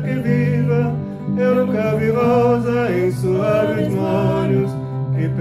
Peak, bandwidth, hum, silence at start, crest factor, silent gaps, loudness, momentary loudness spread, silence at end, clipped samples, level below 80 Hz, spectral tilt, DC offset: -4 dBFS; 14 kHz; none; 0 s; 12 dB; none; -18 LUFS; 7 LU; 0 s; under 0.1%; -46 dBFS; -8.5 dB/octave; under 0.1%